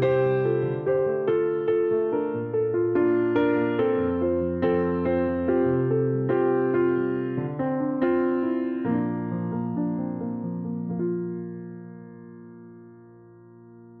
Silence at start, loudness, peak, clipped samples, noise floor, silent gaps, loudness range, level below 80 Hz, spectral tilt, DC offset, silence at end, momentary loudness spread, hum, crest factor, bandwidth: 0 s; -25 LUFS; -10 dBFS; under 0.1%; -49 dBFS; none; 9 LU; -56 dBFS; -11 dB/octave; under 0.1%; 0 s; 11 LU; none; 14 dB; 4.3 kHz